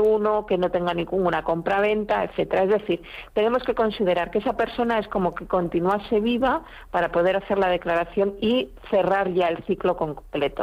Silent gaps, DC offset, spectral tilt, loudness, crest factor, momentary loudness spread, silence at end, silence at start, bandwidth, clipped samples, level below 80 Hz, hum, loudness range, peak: none; under 0.1%; -7.5 dB/octave; -23 LUFS; 12 dB; 4 LU; 0 s; 0 s; 14.5 kHz; under 0.1%; -48 dBFS; none; 1 LU; -10 dBFS